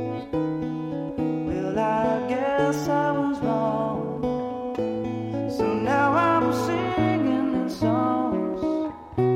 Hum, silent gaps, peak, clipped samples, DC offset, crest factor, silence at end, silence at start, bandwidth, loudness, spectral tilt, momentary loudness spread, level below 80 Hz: none; none; -10 dBFS; under 0.1%; under 0.1%; 14 dB; 0 s; 0 s; 16 kHz; -25 LUFS; -7 dB/octave; 8 LU; -52 dBFS